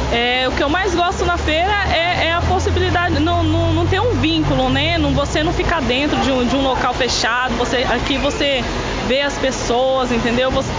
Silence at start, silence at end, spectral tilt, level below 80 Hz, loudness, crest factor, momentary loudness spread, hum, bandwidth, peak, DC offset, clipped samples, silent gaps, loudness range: 0 s; 0 s; -5 dB/octave; -26 dBFS; -17 LUFS; 14 dB; 2 LU; none; 7.6 kHz; -2 dBFS; under 0.1%; under 0.1%; none; 1 LU